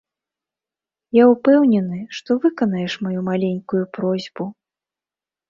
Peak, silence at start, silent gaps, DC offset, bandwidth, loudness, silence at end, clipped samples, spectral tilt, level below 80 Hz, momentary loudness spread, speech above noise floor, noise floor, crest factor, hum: -2 dBFS; 1.15 s; none; under 0.1%; 7.2 kHz; -18 LUFS; 1 s; under 0.1%; -7.5 dB/octave; -64 dBFS; 14 LU; over 72 dB; under -90 dBFS; 18 dB; none